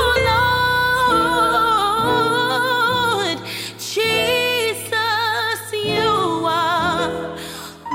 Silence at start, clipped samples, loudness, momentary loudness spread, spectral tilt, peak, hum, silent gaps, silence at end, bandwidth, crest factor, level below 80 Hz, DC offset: 0 s; under 0.1%; -18 LUFS; 9 LU; -3.5 dB/octave; -6 dBFS; none; none; 0 s; 17 kHz; 14 dB; -44 dBFS; under 0.1%